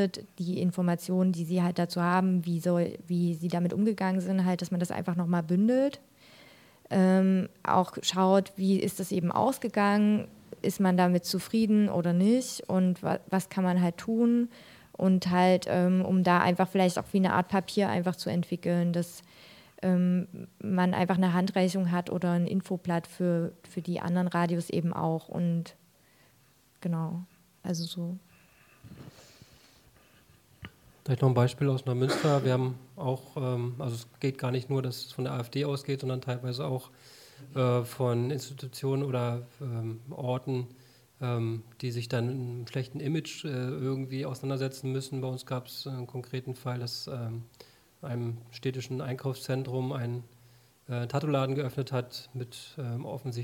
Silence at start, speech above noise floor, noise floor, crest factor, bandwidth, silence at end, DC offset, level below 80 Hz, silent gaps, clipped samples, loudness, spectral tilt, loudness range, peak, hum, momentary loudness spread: 0 s; 35 dB; -64 dBFS; 20 dB; 16 kHz; 0 s; under 0.1%; -70 dBFS; none; under 0.1%; -29 LUFS; -6.5 dB/octave; 9 LU; -10 dBFS; none; 12 LU